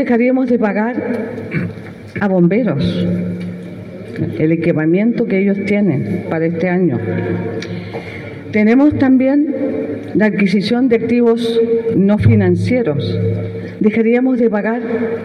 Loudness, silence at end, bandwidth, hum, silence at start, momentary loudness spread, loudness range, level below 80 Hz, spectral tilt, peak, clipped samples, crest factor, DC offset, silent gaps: -15 LUFS; 0 s; 10.5 kHz; none; 0 s; 13 LU; 4 LU; -46 dBFS; -8.5 dB/octave; 0 dBFS; under 0.1%; 14 dB; under 0.1%; none